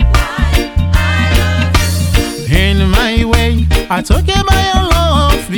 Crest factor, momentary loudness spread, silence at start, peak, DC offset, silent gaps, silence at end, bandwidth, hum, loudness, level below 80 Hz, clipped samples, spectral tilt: 10 dB; 3 LU; 0 s; 0 dBFS; under 0.1%; none; 0 s; 19.5 kHz; none; -12 LUFS; -14 dBFS; 0.2%; -5 dB/octave